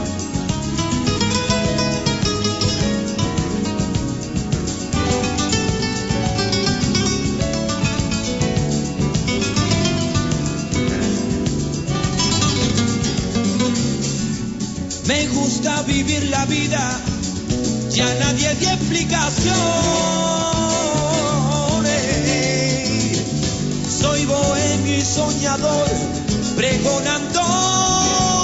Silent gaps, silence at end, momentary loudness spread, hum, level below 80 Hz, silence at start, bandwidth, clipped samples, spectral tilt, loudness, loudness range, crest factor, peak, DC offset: none; 0 s; 5 LU; none; -34 dBFS; 0 s; 8.2 kHz; under 0.1%; -4 dB/octave; -19 LUFS; 2 LU; 14 dB; -4 dBFS; under 0.1%